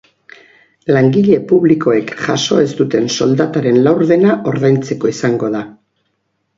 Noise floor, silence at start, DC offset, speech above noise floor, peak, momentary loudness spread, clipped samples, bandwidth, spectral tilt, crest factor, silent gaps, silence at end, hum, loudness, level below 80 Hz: -67 dBFS; 0.85 s; under 0.1%; 54 dB; 0 dBFS; 7 LU; under 0.1%; 7.8 kHz; -6 dB/octave; 14 dB; none; 0.85 s; none; -13 LUFS; -56 dBFS